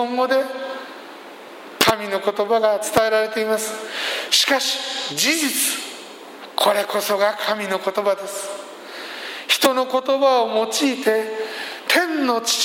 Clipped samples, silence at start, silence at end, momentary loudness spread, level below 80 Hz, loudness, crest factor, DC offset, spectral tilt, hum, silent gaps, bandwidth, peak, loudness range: under 0.1%; 0 s; 0 s; 16 LU; -62 dBFS; -20 LUFS; 20 dB; under 0.1%; -1.5 dB/octave; none; none; 16.5 kHz; 0 dBFS; 3 LU